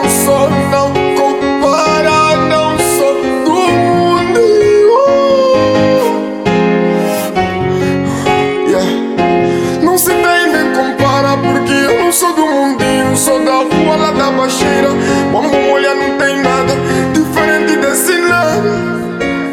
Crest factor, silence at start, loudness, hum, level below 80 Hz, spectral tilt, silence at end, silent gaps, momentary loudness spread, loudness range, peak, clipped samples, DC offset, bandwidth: 10 dB; 0 s; -11 LUFS; none; -40 dBFS; -4.5 dB/octave; 0 s; none; 4 LU; 3 LU; 0 dBFS; under 0.1%; under 0.1%; 17 kHz